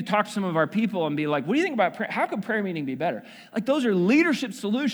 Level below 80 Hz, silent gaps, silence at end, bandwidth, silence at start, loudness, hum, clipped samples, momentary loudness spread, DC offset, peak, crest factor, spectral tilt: -76 dBFS; none; 0 s; over 20 kHz; 0 s; -25 LUFS; none; under 0.1%; 9 LU; under 0.1%; -6 dBFS; 18 dB; -6 dB/octave